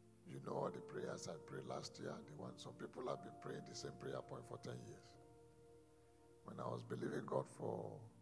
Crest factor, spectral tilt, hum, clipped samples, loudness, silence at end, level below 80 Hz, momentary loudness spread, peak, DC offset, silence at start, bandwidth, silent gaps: 24 dB; -5.5 dB/octave; none; under 0.1%; -50 LUFS; 0 s; -80 dBFS; 20 LU; -26 dBFS; under 0.1%; 0 s; 11 kHz; none